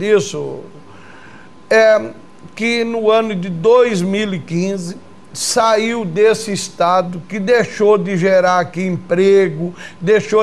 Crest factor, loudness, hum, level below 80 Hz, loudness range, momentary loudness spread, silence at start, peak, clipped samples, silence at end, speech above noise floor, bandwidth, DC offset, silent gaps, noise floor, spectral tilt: 12 dB; -15 LUFS; none; -60 dBFS; 2 LU; 13 LU; 0 s; -2 dBFS; under 0.1%; 0 s; 26 dB; 13 kHz; 0.9%; none; -40 dBFS; -5 dB/octave